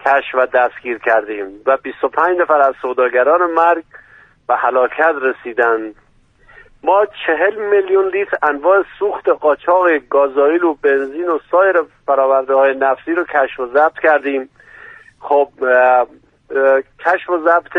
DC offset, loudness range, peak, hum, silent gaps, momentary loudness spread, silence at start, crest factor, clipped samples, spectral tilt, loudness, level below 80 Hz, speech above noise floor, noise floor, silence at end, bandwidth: under 0.1%; 2 LU; 0 dBFS; none; none; 7 LU; 0.05 s; 14 dB; under 0.1%; -5.5 dB/octave; -15 LUFS; -58 dBFS; 35 dB; -50 dBFS; 0 s; 4.6 kHz